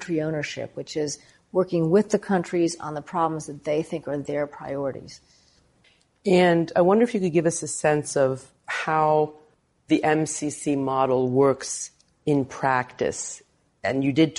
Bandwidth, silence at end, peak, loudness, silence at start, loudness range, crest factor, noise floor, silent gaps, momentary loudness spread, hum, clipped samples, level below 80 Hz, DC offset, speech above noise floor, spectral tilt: 11.5 kHz; 0 s; -8 dBFS; -24 LUFS; 0 s; 5 LU; 18 dB; -62 dBFS; none; 12 LU; none; under 0.1%; -62 dBFS; under 0.1%; 38 dB; -5.5 dB/octave